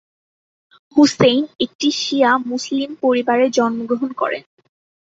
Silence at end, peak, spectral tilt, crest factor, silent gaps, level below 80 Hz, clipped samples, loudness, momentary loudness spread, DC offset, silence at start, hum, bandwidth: 0.65 s; -2 dBFS; -4 dB/octave; 16 dB; 1.75-1.79 s; -58 dBFS; under 0.1%; -17 LUFS; 8 LU; under 0.1%; 0.95 s; none; 8 kHz